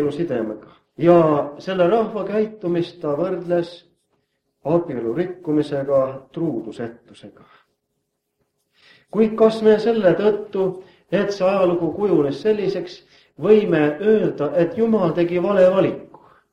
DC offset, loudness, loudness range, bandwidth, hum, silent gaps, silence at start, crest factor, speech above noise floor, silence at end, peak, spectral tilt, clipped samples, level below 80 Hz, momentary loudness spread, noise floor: under 0.1%; -19 LUFS; 7 LU; 9 kHz; none; none; 0 s; 20 dB; 56 dB; 0.45 s; 0 dBFS; -8 dB/octave; under 0.1%; -60 dBFS; 11 LU; -75 dBFS